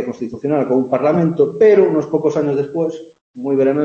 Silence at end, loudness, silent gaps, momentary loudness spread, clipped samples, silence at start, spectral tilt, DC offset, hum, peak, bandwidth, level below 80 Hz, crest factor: 0 s; -16 LUFS; 3.21-3.34 s; 13 LU; under 0.1%; 0 s; -8.5 dB/octave; under 0.1%; none; -2 dBFS; 7.2 kHz; -60 dBFS; 14 dB